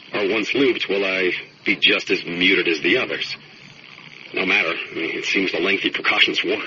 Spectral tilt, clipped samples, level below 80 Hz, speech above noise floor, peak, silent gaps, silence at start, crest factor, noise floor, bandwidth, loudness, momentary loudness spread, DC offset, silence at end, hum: -0.5 dB/octave; under 0.1%; -64 dBFS; 23 dB; -2 dBFS; none; 0 s; 20 dB; -43 dBFS; 7.4 kHz; -19 LUFS; 9 LU; under 0.1%; 0 s; none